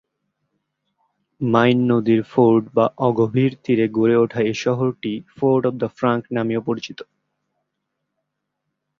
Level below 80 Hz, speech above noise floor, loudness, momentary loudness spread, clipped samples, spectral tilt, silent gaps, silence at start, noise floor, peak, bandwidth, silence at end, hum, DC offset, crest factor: -60 dBFS; 59 dB; -19 LUFS; 10 LU; under 0.1%; -7.5 dB/octave; none; 1.4 s; -78 dBFS; -2 dBFS; 7.2 kHz; 1.95 s; none; under 0.1%; 18 dB